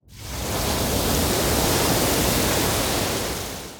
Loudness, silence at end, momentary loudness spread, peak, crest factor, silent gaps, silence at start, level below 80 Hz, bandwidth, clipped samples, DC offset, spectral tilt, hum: -21 LUFS; 0 s; 8 LU; -8 dBFS; 14 dB; none; 0.1 s; -34 dBFS; over 20 kHz; under 0.1%; under 0.1%; -3.5 dB/octave; none